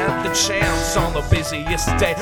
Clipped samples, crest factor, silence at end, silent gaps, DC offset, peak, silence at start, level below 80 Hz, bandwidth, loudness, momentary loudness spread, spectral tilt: under 0.1%; 18 dB; 0 s; none; under 0.1%; -2 dBFS; 0 s; -28 dBFS; over 20 kHz; -19 LUFS; 3 LU; -3.5 dB/octave